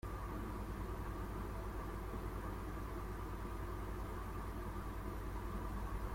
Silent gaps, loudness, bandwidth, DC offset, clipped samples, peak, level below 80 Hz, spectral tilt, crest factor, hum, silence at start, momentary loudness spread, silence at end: none; -46 LUFS; 16.5 kHz; under 0.1%; under 0.1%; -32 dBFS; -46 dBFS; -6.5 dB/octave; 12 dB; none; 0.05 s; 1 LU; 0 s